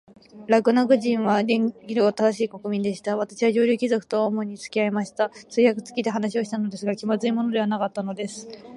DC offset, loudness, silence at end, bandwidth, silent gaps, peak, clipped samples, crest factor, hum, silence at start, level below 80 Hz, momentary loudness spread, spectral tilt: under 0.1%; -23 LUFS; 0 s; 11.5 kHz; none; -4 dBFS; under 0.1%; 18 dB; none; 0.35 s; -72 dBFS; 8 LU; -5.5 dB/octave